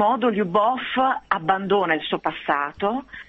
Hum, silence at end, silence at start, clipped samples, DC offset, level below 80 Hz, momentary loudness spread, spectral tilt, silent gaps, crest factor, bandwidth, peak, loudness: none; 0.05 s; 0 s; under 0.1%; under 0.1%; -58 dBFS; 5 LU; -7.5 dB/octave; none; 18 dB; 7.6 kHz; -4 dBFS; -22 LUFS